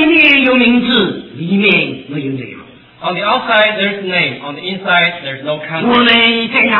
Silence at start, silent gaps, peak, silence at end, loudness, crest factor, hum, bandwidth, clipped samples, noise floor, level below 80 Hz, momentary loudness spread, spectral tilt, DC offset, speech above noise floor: 0 s; none; 0 dBFS; 0 s; -11 LUFS; 12 dB; none; 5.4 kHz; under 0.1%; -36 dBFS; -50 dBFS; 15 LU; -7 dB/octave; under 0.1%; 23 dB